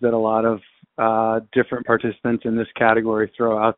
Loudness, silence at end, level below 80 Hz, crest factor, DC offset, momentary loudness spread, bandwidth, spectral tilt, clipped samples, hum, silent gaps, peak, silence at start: -20 LUFS; 0.05 s; -56 dBFS; 20 dB; under 0.1%; 6 LU; 4 kHz; -5 dB/octave; under 0.1%; none; none; 0 dBFS; 0 s